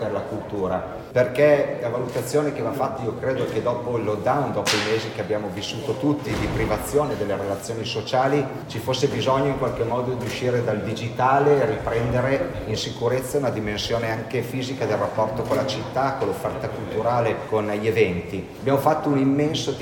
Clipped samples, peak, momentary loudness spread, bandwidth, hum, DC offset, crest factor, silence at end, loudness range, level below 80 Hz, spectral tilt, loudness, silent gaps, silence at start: under 0.1%; -4 dBFS; 7 LU; 17.5 kHz; none; under 0.1%; 20 dB; 0 s; 2 LU; -46 dBFS; -5.5 dB/octave; -23 LUFS; none; 0 s